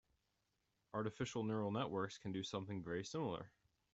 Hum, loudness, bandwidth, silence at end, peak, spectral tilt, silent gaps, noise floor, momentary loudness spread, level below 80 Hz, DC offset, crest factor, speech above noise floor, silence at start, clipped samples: none; -44 LUFS; 8.2 kHz; 0.45 s; -28 dBFS; -5.5 dB/octave; none; -86 dBFS; 6 LU; -76 dBFS; under 0.1%; 18 dB; 42 dB; 0.95 s; under 0.1%